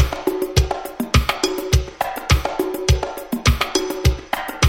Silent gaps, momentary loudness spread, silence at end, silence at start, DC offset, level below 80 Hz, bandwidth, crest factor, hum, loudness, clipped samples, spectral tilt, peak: none; 7 LU; 0 s; 0 s; under 0.1%; -24 dBFS; 18 kHz; 18 dB; none; -20 LUFS; under 0.1%; -4.5 dB/octave; -2 dBFS